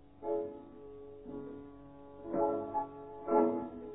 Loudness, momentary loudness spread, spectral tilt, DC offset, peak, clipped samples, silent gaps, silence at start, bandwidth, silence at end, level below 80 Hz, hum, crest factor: -36 LUFS; 21 LU; -4.5 dB/octave; under 0.1%; -18 dBFS; under 0.1%; none; 0 s; 3.9 kHz; 0 s; -66 dBFS; none; 20 dB